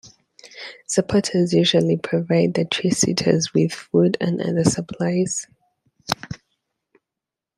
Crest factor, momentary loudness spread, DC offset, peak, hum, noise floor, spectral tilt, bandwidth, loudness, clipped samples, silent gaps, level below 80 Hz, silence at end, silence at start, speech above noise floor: 20 dB; 18 LU; under 0.1%; -2 dBFS; none; -86 dBFS; -5 dB/octave; 13 kHz; -20 LUFS; under 0.1%; none; -56 dBFS; 1.2 s; 0.05 s; 67 dB